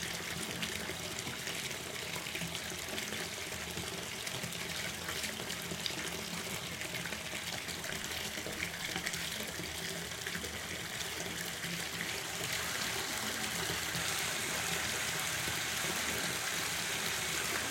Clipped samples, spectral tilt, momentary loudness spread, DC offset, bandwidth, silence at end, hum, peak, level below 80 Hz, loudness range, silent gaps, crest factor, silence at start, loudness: under 0.1%; -1.5 dB/octave; 5 LU; under 0.1%; 17 kHz; 0 s; none; -16 dBFS; -62 dBFS; 4 LU; none; 22 dB; 0 s; -36 LUFS